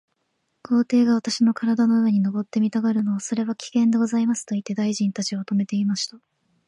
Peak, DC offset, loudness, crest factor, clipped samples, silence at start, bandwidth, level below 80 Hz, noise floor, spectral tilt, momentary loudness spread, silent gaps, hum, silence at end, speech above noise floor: -10 dBFS; under 0.1%; -22 LUFS; 12 dB; under 0.1%; 0.7 s; 11 kHz; -72 dBFS; -73 dBFS; -5.5 dB/octave; 7 LU; none; none; 0.5 s; 52 dB